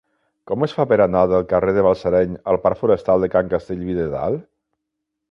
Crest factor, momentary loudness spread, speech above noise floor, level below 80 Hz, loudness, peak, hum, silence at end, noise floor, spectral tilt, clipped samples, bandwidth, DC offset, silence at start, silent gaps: 16 dB; 8 LU; 61 dB; -44 dBFS; -19 LUFS; -2 dBFS; none; 0.9 s; -79 dBFS; -9 dB/octave; under 0.1%; 6.6 kHz; under 0.1%; 0.5 s; none